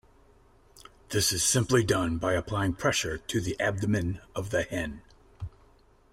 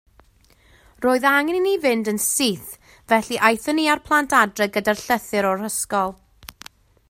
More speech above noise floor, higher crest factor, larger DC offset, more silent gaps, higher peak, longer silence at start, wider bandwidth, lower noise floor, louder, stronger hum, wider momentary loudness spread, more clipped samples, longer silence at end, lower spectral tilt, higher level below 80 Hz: second, 32 dB vs 36 dB; about the same, 18 dB vs 22 dB; neither; neither; second, -10 dBFS vs 0 dBFS; about the same, 1.1 s vs 1 s; about the same, 16 kHz vs 16 kHz; first, -60 dBFS vs -56 dBFS; second, -28 LUFS vs -20 LUFS; neither; first, 17 LU vs 7 LU; neither; about the same, 0.65 s vs 0.65 s; about the same, -4 dB/octave vs -3 dB/octave; first, -50 dBFS vs -56 dBFS